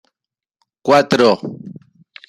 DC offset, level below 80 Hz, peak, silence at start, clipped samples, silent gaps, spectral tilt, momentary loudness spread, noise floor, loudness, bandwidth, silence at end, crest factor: under 0.1%; -60 dBFS; -2 dBFS; 0.85 s; under 0.1%; none; -5 dB/octave; 22 LU; -87 dBFS; -15 LUFS; 13.5 kHz; 0.55 s; 16 dB